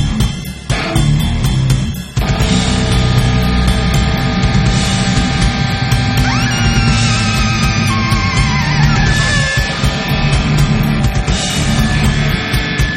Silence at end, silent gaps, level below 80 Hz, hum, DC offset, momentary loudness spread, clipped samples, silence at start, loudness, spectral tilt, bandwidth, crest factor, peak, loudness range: 0 s; none; -20 dBFS; none; under 0.1%; 3 LU; under 0.1%; 0 s; -13 LUFS; -5 dB/octave; 15.5 kHz; 12 dB; 0 dBFS; 1 LU